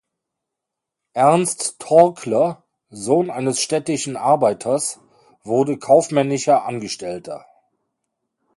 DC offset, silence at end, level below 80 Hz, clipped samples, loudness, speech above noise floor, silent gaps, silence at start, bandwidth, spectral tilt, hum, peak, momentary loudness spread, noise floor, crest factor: under 0.1%; 1.2 s; -66 dBFS; under 0.1%; -18 LUFS; 65 dB; none; 1.15 s; 11.5 kHz; -4.5 dB/octave; none; 0 dBFS; 15 LU; -83 dBFS; 20 dB